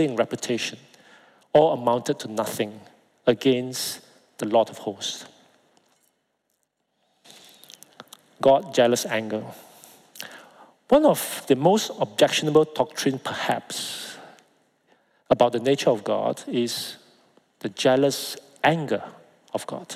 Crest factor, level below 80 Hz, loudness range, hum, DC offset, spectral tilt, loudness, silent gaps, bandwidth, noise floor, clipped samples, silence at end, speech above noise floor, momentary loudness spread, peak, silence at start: 20 dB; -66 dBFS; 7 LU; none; under 0.1%; -4.5 dB/octave; -23 LUFS; none; 16 kHz; -74 dBFS; under 0.1%; 0 s; 52 dB; 15 LU; -6 dBFS; 0 s